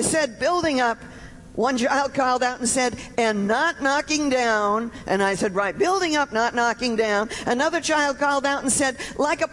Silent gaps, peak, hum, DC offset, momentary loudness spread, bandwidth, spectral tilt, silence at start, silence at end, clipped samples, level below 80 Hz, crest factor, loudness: none; -8 dBFS; none; under 0.1%; 4 LU; 11.5 kHz; -3 dB/octave; 0 s; 0 s; under 0.1%; -50 dBFS; 14 dB; -22 LUFS